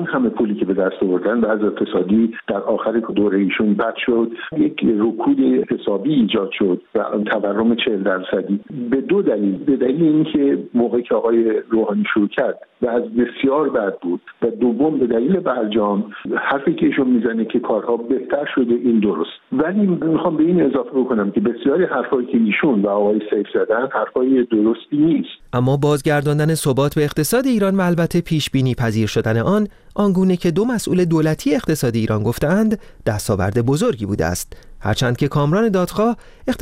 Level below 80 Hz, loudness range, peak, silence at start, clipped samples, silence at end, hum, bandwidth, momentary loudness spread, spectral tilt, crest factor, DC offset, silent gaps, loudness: -46 dBFS; 2 LU; -4 dBFS; 0 s; under 0.1%; 0 s; none; 16.5 kHz; 5 LU; -6.5 dB/octave; 14 dB; under 0.1%; none; -18 LUFS